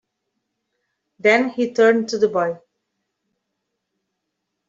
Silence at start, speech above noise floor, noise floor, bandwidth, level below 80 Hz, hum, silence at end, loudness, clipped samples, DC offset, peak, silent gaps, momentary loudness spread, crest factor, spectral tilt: 1.25 s; 61 dB; -78 dBFS; 7.8 kHz; -72 dBFS; none; 2.1 s; -18 LUFS; under 0.1%; under 0.1%; -2 dBFS; none; 8 LU; 20 dB; -4.5 dB/octave